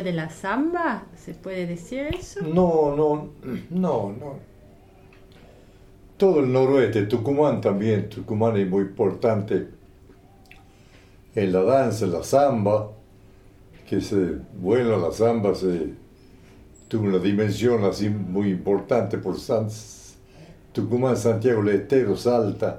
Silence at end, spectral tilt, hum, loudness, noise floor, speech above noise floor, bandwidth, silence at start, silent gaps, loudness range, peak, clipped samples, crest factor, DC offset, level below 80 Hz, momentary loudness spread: 0 s; -7 dB/octave; none; -23 LUFS; -51 dBFS; 28 dB; 15 kHz; 0 s; none; 4 LU; -6 dBFS; under 0.1%; 18 dB; under 0.1%; -50 dBFS; 12 LU